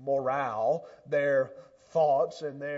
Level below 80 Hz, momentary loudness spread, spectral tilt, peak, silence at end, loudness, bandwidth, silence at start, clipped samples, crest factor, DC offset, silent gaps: -76 dBFS; 8 LU; -6.5 dB/octave; -16 dBFS; 0 s; -29 LUFS; 7.8 kHz; 0 s; under 0.1%; 14 dB; under 0.1%; none